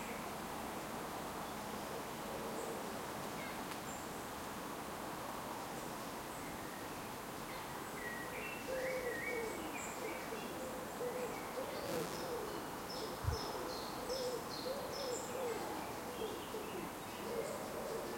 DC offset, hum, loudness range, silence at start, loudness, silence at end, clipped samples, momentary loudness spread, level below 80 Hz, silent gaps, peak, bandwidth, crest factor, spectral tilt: under 0.1%; none; 3 LU; 0 s; -43 LUFS; 0 s; under 0.1%; 4 LU; -62 dBFS; none; -26 dBFS; 16.5 kHz; 18 dB; -3.5 dB/octave